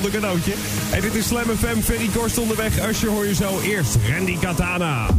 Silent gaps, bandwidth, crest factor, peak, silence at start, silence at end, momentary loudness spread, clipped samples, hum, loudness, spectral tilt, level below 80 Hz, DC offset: none; 16 kHz; 14 dB; -6 dBFS; 0 s; 0 s; 2 LU; under 0.1%; none; -21 LUFS; -4.5 dB/octave; -32 dBFS; under 0.1%